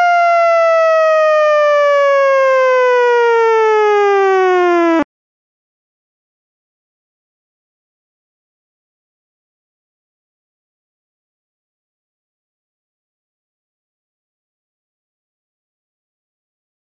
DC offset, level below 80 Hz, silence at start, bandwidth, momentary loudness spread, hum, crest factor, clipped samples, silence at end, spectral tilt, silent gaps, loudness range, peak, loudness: under 0.1%; -68 dBFS; 0 s; 7.2 kHz; 1 LU; none; 14 dB; under 0.1%; 11.9 s; 0 dB/octave; none; 8 LU; -2 dBFS; -11 LUFS